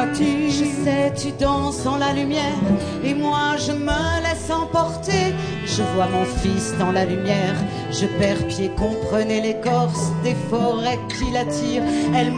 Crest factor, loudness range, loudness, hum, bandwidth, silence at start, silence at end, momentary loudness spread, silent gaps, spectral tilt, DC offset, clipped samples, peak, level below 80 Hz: 14 dB; 1 LU; -21 LUFS; none; 10 kHz; 0 s; 0 s; 3 LU; none; -5.5 dB/octave; under 0.1%; under 0.1%; -6 dBFS; -38 dBFS